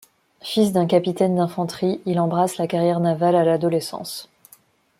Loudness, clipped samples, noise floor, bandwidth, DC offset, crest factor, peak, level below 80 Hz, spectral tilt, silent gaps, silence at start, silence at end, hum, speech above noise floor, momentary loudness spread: -21 LUFS; under 0.1%; -54 dBFS; 16 kHz; under 0.1%; 18 dB; -4 dBFS; -64 dBFS; -6.5 dB/octave; none; 0.45 s; 0.75 s; none; 35 dB; 11 LU